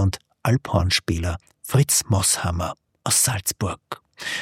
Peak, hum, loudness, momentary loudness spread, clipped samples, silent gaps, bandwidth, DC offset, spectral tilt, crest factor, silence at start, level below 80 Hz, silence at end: -4 dBFS; none; -22 LUFS; 13 LU; under 0.1%; none; 16.5 kHz; under 0.1%; -3.5 dB/octave; 18 dB; 0 s; -44 dBFS; 0 s